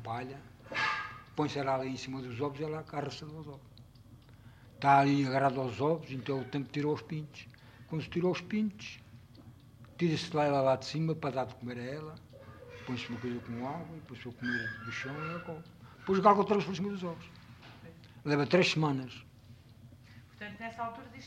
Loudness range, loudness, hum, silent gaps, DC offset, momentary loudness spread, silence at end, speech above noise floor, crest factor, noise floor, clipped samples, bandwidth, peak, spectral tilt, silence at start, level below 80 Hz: 8 LU; -33 LUFS; none; none; under 0.1%; 23 LU; 0 s; 23 dB; 22 dB; -56 dBFS; under 0.1%; 15 kHz; -12 dBFS; -6 dB/octave; 0 s; -66 dBFS